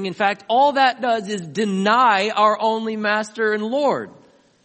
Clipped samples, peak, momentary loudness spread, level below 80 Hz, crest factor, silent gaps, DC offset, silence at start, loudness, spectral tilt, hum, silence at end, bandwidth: under 0.1%; -2 dBFS; 8 LU; -72 dBFS; 18 dB; none; under 0.1%; 0 s; -19 LUFS; -4.5 dB/octave; none; 0.55 s; 8.8 kHz